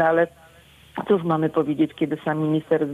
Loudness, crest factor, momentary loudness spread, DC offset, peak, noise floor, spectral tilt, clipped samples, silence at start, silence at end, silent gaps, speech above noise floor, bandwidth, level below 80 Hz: -23 LUFS; 16 dB; 6 LU; under 0.1%; -6 dBFS; -51 dBFS; -8.5 dB/octave; under 0.1%; 0 s; 0 s; none; 29 dB; 11.5 kHz; -62 dBFS